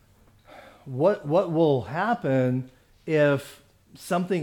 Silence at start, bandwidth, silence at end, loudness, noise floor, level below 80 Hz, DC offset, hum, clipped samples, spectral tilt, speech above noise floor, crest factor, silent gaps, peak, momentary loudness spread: 0.55 s; 18.5 kHz; 0 s; -24 LUFS; -56 dBFS; -62 dBFS; under 0.1%; none; under 0.1%; -7.5 dB/octave; 33 dB; 16 dB; none; -10 dBFS; 21 LU